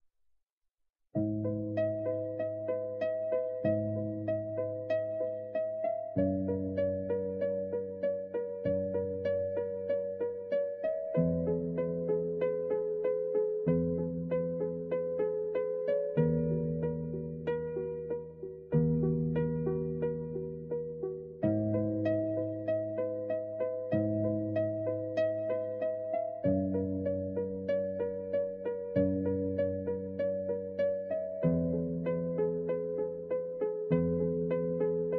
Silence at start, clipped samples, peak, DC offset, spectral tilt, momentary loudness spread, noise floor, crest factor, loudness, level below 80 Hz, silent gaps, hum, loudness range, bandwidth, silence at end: 1.15 s; under 0.1%; -16 dBFS; under 0.1%; -9.5 dB/octave; 5 LU; -81 dBFS; 16 dB; -33 LUFS; -60 dBFS; none; none; 2 LU; 5.4 kHz; 0 s